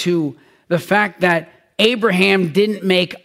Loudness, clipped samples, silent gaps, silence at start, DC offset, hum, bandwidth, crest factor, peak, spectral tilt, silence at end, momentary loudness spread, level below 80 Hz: -16 LUFS; under 0.1%; none; 0 s; under 0.1%; none; 16 kHz; 16 dB; -2 dBFS; -5.5 dB/octave; 0.05 s; 8 LU; -60 dBFS